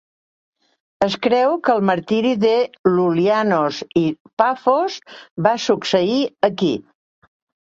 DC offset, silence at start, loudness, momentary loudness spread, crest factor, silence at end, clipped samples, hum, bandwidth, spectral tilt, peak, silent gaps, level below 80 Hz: under 0.1%; 1 s; -18 LUFS; 5 LU; 18 dB; 0.85 s; under 0.1%; none; 7.8 kHz; -6 dB/octave; -2 dBFS; 2.79-2.84 s, 4.20-4.25 s, 4.33-4.37 s, 5.31-5.36 s; -60 dBFS